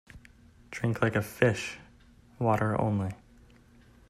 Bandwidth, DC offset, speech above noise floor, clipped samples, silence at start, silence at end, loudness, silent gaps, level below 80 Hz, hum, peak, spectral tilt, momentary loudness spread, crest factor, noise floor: 15 kHz; under 0.1%; 30 dB; under 0.1%; 0.15 s; 0.95 s; -29 LUFS; none; -58 dBFS; none; -8 dBFS; -6.5 dB/octave; 15 LU; 22 dB; -57 dBFS